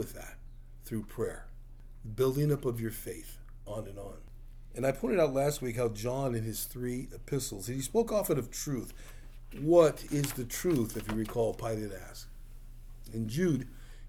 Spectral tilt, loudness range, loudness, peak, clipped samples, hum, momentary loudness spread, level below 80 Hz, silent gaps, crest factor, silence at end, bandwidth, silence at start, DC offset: -6 dB/octave; 5 LU; -32 LUFS; -10 dBFS; under 0.1%; none; 20 LU; -48 dBFS; none; 22 dB; 0 s; over 20 kHz; 0 s; under 0.1%